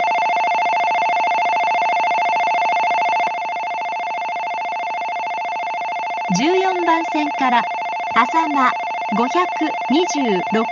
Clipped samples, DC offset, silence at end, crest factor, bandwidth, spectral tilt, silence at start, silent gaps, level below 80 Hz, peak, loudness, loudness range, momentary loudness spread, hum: under 0.1%; under 0.1%; 0 s; 16 dB; 7.4 kHz; -4 dB/octave; 0 s; none; -68 dBFS; -2 dBFS; -18 LUFS; 4 LU; 6 LU; none